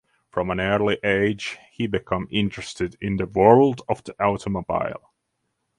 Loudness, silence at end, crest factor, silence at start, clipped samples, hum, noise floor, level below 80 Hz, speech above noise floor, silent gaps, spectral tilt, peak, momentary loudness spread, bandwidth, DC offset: -23 LUFS; 0.8 s; 22 dB; 0.35 s; under 0.1%; none; -76 dBFS; -48 dBFS; 54 dB; none; -6.5 dB/octave; 0 dBFS; 13 LU; 11 kHz; under 0.1%